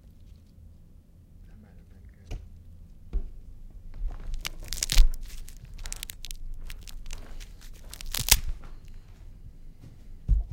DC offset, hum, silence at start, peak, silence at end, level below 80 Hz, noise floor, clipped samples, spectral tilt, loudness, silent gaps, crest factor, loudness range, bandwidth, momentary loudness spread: under 0.1%; none; 0.05 s; 0 dBFS; 0 s; -32 dBFS; -52 dBFS; under 0.1%; -1.5 dB/octave; -30 LUFS; none; 30 dB; 15 LU; 17 kHz; 27 LU